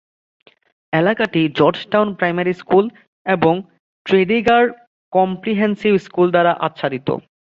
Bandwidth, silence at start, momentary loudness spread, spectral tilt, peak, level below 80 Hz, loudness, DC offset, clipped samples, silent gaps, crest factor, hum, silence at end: 7.4 kHz; 0.9 s; 8 LU; -7.5 dB/octave; -2 dBFS; -56 dBFS; -17 LUFS; under 0.1%; under 0.1%; 3.07-3.25 s, 3.80-4.05 s, 4.87-5.12 s; 16 dB; none; 0.25 s